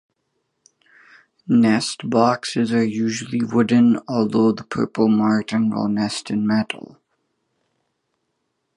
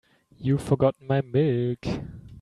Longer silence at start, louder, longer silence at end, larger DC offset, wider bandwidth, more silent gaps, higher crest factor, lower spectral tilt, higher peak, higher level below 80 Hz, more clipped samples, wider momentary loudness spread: first, 1.5 s vs 0.4 s; first, -19 LUFS vs -25 LUFS; first, 2 s vs 0 s; neither; about the same, 11 kHz vs 12 kHz; neither; about the same, 18 dB vs 18 dB; second, -6 dB/octave vs -8.5 dB/octave; first, -2 dBFS vs -8 dBFS; second, -62 dBFS vs -50 dBFS; neither; about the same, 8 LU vs 10 LU